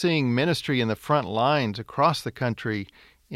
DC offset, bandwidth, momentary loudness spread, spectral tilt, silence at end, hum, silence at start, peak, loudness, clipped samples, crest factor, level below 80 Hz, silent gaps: under 0.1%; 15.5 kHz; 7 LU; -6 dB/octave; 0 s; none; 0 s; -6 dBFS; -25 LUFS; under 0.1%; 18 dB; -60 dBFS; none